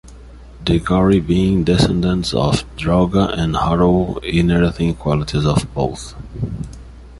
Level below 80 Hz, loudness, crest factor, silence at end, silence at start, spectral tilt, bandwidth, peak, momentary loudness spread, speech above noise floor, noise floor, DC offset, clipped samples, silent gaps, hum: -30 dBFS; -17 LUFS; 16 dB; 0 s; 0.05 s; -6.5 dB/octave; 11.5 kHz; 0 dBFS; 12 LU; 22 dB; -38 dBFS; under 0.1%; under 0.1%; none; none